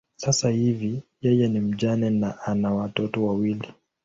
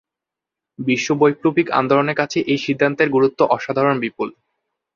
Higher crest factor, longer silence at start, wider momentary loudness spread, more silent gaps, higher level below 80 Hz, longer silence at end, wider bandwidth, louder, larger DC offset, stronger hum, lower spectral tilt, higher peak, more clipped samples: about the same, 16 dB vs 18 dB; second, 0.2 s vs 0.8 s; about the same, 6 LU vs 7 LU; neither; first, -56 dBFS vs -62 dBFS; second, 0.35 s vs 0.65 s; about the same, 8 kHz vs 7.4 kHz; second, -24 LUFS vs -18 LUFS; neither; neither; about the same, -5.5 dB/octave vs -5.5 dB/octave; second, -8 dBFS vs 0 dBFS; neither